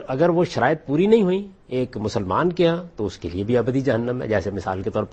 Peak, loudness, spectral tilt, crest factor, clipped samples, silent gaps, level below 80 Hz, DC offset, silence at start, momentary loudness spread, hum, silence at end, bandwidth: -4 dBFS; -22 LUFS; -7.5 dB/octave; 18 dB; under 0.1%; none; -48 dBFS; under 0.1%; 0 s; 9 LU; none; 0 s; 8.6 kHz